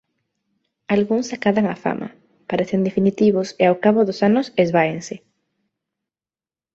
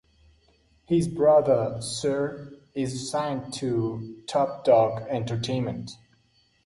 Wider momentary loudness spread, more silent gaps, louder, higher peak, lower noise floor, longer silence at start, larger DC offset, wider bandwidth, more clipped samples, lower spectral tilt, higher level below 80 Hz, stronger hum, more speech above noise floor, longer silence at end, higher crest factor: about the same, 12 LU vs 12 LU; neither; first, -19 LUFS vs -25 LUFS; first, -2 dBFS vs -8 dBFS; first, under -90 dBFS vs -65 dBFS; about the same, 0.9 s vs 0.9 s; neither; second, 7.8 kHz vs 11.5 kHz; neither; about the same, -6.5 dB/octave vs -6 dB/octave; about the same, -60 dBFS vs -58 dBFS; neither; first, over 72 dB vs 40 dB; first, 1.6 s vs 0.7 s; about the same, 18 dB vs 18 dB